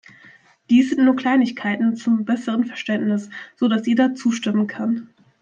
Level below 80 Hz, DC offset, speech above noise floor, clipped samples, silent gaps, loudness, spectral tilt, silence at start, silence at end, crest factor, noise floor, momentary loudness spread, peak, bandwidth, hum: -68 dBFS; under 0.1%; 31 dB; under 0.1%; none; -20 LUFS; -6 dB/octave; 0.7 s; 0.35 s; 14 dB; -50 dBFS; 7 LU; -6 dBFS; 7.6 kHz; none